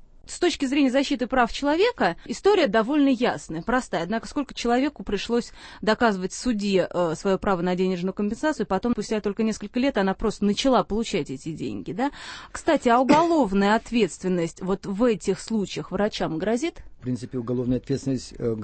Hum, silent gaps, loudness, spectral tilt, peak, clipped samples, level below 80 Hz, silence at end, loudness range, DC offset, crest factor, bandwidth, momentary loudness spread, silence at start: none; none; -24 LUFS; -5.5 dB/octave; -4 dBFS; under 0.1%; -46 dBFS; 0 s; 4 LU; under 0.1%; 18 dB; 8.8 kHz; 9 LU; 0.25 s